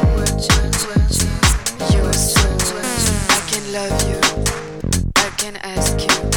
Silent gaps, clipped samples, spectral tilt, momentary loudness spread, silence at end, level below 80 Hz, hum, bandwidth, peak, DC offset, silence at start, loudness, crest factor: none; under 0.1%; -3.5 dB/octave; 6 LU; 0 s; -22 dBFS; none; 19.5 kHz; 0 dBFS; under 0.1%; 0 s; -17 LUFS; 16 dB